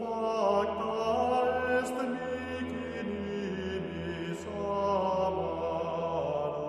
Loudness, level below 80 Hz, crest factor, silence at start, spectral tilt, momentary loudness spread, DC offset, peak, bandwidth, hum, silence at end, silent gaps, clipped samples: -32 LUFS; -56 dBFS; 16 dB; 0 s; -6 dB/octave; 8 LU; under 0.1%; -16 dBFS; 13 kHz; none; 0 s; none; under 0.1%